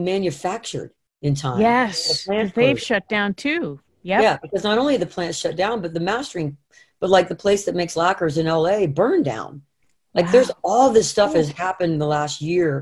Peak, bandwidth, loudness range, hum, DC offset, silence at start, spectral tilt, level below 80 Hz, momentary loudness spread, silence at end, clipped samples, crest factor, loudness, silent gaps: -2 dBFS; 12.5 kHz; 3 LU; none; under 0.1%; 0 s; -5 dB/octave; -54 dBFS; 11 LU; 0 s; under 0.1%; 18 dB; -20 LUFS; none